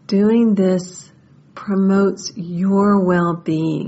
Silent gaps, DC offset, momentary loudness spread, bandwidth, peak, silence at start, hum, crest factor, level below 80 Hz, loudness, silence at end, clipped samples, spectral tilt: none; under 0.1%; 12 LU; 8 kHz; -4 dBFS; 0.1 s; none; 14 dB; -56 dBFS; -17 LUFS; 0 s; under 0.1%; -7.5 dB/octave